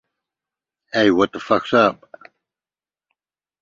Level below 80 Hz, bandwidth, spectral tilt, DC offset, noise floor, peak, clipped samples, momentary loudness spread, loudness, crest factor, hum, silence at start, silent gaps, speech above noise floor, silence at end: -60 dBFS; 7.6 kHz; -5.5 dB/octave; under 0.1%; under -90 dBFS; -2 dBFS; under 0.1%; 5 LU; -18 LUFS; 20 dB; none; 0.95 s; none; over 73 dB; 1.7 s